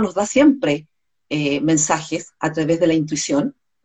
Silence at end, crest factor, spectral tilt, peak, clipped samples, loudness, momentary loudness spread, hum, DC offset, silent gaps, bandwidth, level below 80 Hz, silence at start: 0.35 s; 16 dB; -4.5 dB/octave; -2 dBFS; under 0.1%; -19 LUFS; 11 LU; none; under 0.1%; none; 9.2 kHz; -56 dBFS; 0 s